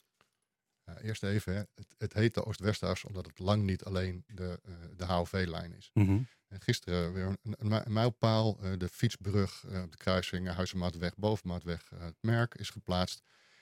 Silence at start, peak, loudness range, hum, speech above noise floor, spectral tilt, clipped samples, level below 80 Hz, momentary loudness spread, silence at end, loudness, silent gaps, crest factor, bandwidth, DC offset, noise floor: 0.85 s; -12 dBFS; 3 LU; none; 51 dB; -6.5 dB/octave; under 0.1%; -62 dBFS; 12 LU; 0.4 s; -34 LUFS; none; 22 dB; 15.5 kHz; under 0.1%; -85 dBFS